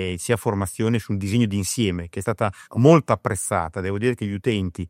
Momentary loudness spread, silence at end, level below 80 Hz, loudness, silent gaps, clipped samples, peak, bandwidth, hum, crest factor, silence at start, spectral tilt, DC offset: 9 LU; 0 s; -54 dBFS; -22 LUFS; none; under 0.1%; -2 dBFS; 16 kHz; none; 20 dB; 0 s; -6 dB/octave; under 0.1%